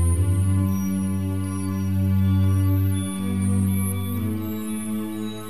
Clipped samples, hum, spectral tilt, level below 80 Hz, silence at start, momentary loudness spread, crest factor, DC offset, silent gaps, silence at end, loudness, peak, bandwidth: under 0.1%; none; -7 dB/octave; -40 dBFS; 0 s; 8 LU; 10 dB; 1%; none; 0 s; -24 LUFS; -10 dBFS; 14 kHz